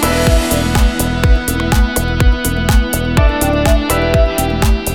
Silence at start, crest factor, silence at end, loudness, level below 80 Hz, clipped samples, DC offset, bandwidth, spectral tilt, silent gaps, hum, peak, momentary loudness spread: 0 s; 12 dB; 0 s; -14 LUFS; -16 dBFS; under 0.1%; 1%; 18 kHz; -5 dB/octave; none; none; 0 dBFS; 2 LU